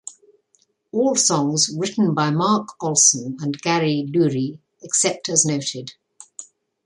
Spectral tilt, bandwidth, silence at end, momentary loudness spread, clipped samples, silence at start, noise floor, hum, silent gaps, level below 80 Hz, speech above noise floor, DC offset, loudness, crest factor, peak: -3.5 dB/octave; 11.5 kHz; 0.45 s; 21 LU; under 0.1%; 0.05 s; -64 dBFS; none; none; -66 dBFS; 44 dB; under 0.1%; -19 LUFS; 20 dB; -2 dBFS